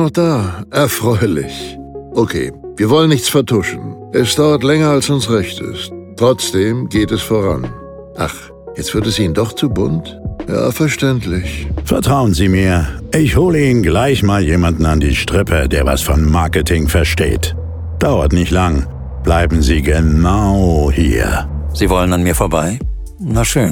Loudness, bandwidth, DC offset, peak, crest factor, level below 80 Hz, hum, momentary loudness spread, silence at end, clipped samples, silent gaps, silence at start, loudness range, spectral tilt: -14 LUFS; 17.5 kHz; 0.1%; 0 dBFS; 14 dB; -22 dBFS; none; 11 LU; 0 s; under 0.1%; none; 0 s; 4 LU; -5.5 dB/octave